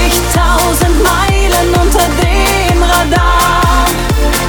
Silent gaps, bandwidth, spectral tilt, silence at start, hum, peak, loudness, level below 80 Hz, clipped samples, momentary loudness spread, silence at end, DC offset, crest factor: none; over 20 kHz; -4 dB/octave; 0 s; none; 0 dBFS; -10 LUFS; -14 dBFS; under 0.1%; 2 LU; 0 s; under 0.1%; 10 dB